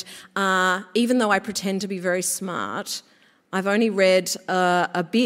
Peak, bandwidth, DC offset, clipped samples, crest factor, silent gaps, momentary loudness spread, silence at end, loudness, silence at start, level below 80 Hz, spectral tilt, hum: -4 dBFS; 16 kHz; under 0.1%; under 0.1%; 18 dB; none; 10 LU; 0 s; -22 LUFS; 0 s; -70 dBFS; -3.5 dB/octave; none